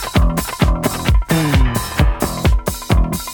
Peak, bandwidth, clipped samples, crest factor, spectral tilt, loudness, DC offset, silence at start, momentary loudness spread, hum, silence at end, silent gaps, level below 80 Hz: -2 dBFS; 18.5 kHz; under 0.1%; 14 dB; -5.5 dB/octave; -17 LUFS; under 0.1%; 0 s; 3 LU; none; 0 s; none; -18 dBFS